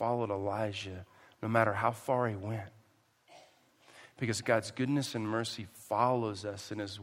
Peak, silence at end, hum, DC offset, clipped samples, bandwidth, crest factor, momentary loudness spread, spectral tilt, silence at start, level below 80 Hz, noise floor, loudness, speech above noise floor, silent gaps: -12 dBFS; 0 s; none; under 0.1%; under 0.1%; 16 kHz; 24 dB; 12 LU; -5.5 dB/octave; 0 s; -74 dBFS; -68 dBFS; -34 LUFS; 35 dB; none